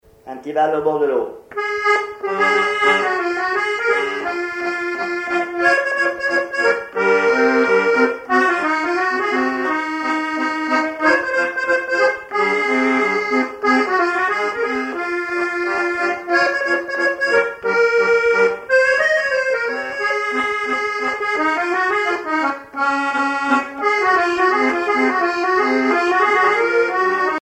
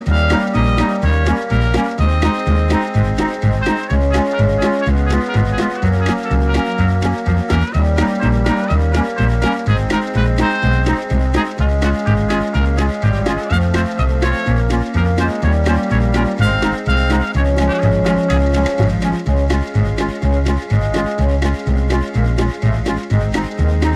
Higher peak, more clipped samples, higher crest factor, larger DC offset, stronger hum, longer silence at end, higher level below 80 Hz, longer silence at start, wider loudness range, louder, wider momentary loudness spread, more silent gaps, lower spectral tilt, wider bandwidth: about the same, -2 dBFS vs -2 dBFS; neither; about the same, 16 dB vs 12 dB; neither; neither; about the same, 0 s vs 0 s; second, -60 dBFS vs -20 dBFS; first, 0.25 s vs 0 s; about the same, 3 LU vs 1 LU; about the same, -17 LUFS vs -16 LUFS; first, 6 LU vs 3 LU; neither; second, -3.5 dB/octave vs -7 dB/octave; about the same, 11 kHz vs 10.5 kHz